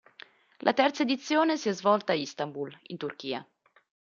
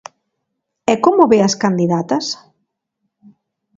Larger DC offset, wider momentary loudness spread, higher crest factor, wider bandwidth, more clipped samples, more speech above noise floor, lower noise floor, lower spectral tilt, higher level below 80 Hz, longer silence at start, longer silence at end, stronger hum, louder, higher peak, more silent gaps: neither; about the same, 13 LU vs 12 LU; about the same, 20 dB vs 18 dB; about the same, 7.4 kHz vs 7.8 kHz; neither; second, 26 dB vs 61 dB; second, -54 dBFS vs -75 dBFS; about the same, -4.5 dB/octave vs -5.5 dB/octave; second, -80 dBFS vs -60 dBFS; second, 0.65 s vs 0.9 s; second, 0.7 s vs 1.4 s; neither; second, -29 LUFS vs -15 LUFS; second, -10 dBFS vs 0 dBFS; neither